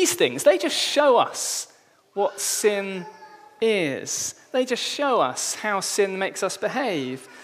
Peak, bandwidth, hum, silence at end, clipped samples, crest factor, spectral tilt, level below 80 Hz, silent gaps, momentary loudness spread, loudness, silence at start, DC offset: -4 dBFS; 15.5 kHz; none; 0 s; under 0.1%; 20 dB; -2 dB/octave; -78 dBFS; none; 10 LU; -23 LUFS; 0 s; under 0.1%